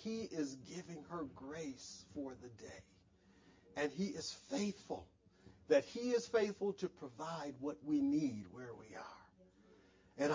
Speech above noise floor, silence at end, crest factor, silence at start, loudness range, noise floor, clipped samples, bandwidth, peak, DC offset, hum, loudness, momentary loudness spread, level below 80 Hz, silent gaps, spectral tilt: 27 dB; 0 s; 22 dB; 0 s; 9 LU; -69 dBFS; under 0.1%; 7.6 kHz; -20 dBFS; under 0.1%; none; -42 LUFS; 18 LU; -74 dBFS; none; -5 dB/octave